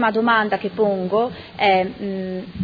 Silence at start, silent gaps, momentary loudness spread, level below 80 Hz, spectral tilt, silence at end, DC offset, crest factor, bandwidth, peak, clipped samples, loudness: 0 s; none; 10 LU; -54 dBFS; -8 dB/octave; 0 s; under 0.1%; 16 dB; 5 kHz; -4 dBFS; under 0.1%; -20 LUFS